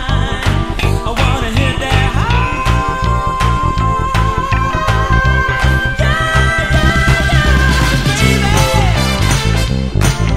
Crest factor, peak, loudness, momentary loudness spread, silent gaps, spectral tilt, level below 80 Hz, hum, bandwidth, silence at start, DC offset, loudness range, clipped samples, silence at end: 12 dB; 0 dBFS; -13 LUFS; 4 LU; none; -5 dB/octave; -18 dBFS; none; 16 kHz; 0 s; under 0.1%; 3 LU; under 0.1%; 0 s